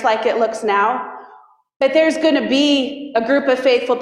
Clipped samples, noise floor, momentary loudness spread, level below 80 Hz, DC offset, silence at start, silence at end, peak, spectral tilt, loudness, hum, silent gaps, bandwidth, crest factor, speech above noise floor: under 0.1%; -47 dBFS; 6 LU; -64 dBFS; under 0.1%; 0 s; 0 s; -4 dBFS; -3.5 dB/octave; -16 LUFS; none; 1.76-1.80 s; 11.5 kHz; 14 dB; 31 dB